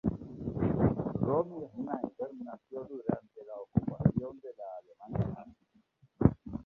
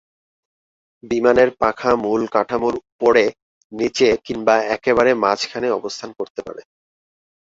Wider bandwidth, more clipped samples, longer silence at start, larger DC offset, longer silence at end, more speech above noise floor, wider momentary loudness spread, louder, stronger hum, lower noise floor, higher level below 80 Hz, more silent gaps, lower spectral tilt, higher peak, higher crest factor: second, 4 kHz vs 7.8 kHz; neither; second, 0.05 s vs 1.05 s; neither; second, 0.05 s vs 0.8 s; second, 34 dB vs over 72 dB; about the same, 16 LU vs 14 LU; second, -34 LUFS vs -18 LUFS; neither; second, -70 dBFS vs under -90 dBFS; about the same, -50 dBFS vs -52 dBFS; second, none vs 2.92-2.99 s, 3.42-3.70 s, 6.30-6.35 s; first, -12.5 dB/octave vs -4.5 dB/octave; second, -8 dBFS vs -2 dBFS; first, 26 dB vs 18 dB